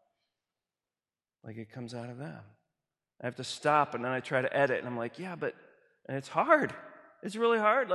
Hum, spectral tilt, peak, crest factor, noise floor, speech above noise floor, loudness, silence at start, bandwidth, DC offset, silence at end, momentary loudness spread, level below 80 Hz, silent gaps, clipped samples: none; -5.5 dB/octave; -10 dBFS; 24 dB; under -90 dBFS; over 59 dB; -31 LUFS; 1.45 s; 12 kHz; under 0.1%; 0 s; 19 LU; -78 dBFS; none; under 0.1%